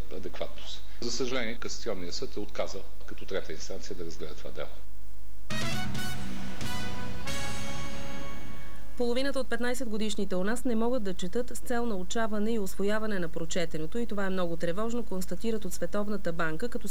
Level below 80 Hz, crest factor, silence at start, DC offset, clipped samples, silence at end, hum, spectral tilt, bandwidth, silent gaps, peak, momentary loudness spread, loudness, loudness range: -48 dBFS; 16 dB; 0 s; 7%; under 0.1%; 0 s; none; -4.5 dB/octave; 19.5 kHz; none; -16 dBFS; 11 LU; -34 LUFS; 6 LU